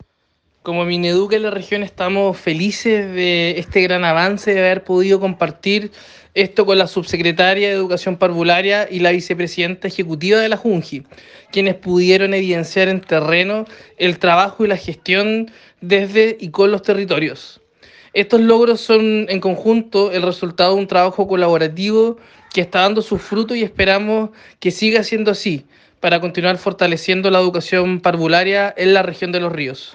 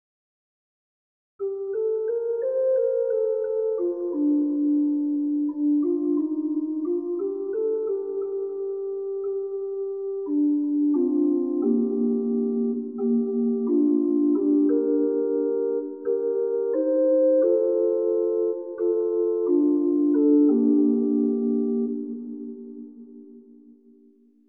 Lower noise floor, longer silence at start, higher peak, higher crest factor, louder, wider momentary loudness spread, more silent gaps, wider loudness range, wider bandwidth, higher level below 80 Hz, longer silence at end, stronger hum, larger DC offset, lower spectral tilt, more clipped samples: first, -64 dBFS vs -57 dBFS; second, 0.65 s vs 1.4 s; first, 0 dBFS vs -10 dBFS; about the same, 16 dB vs 14 dB; first, -16 LUFS vs -24 LUFS; about the same, 8 LU vs 9 LU; neither; second, 2 LU vs 6 LU; first, 8.4 kHz vs 1.8 kHz; first, -52 dBFS vs -80 dBFS; second, 0.05 s vs 1.1 s; neither; neither; second, -5.5 dB/octave vs -13 dB/octave; neither